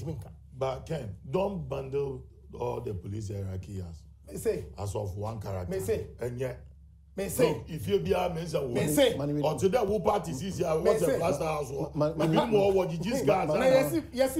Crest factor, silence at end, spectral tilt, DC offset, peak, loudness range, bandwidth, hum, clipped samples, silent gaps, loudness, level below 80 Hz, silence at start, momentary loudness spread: 18 dB; 0 s; -6 dB/octave; under 0.1%; -10 dBFS; 9 LU; 16 kHz; none; under 0.1%; none; -29 LUFS; -50 dBFS; 0 s; 13 LU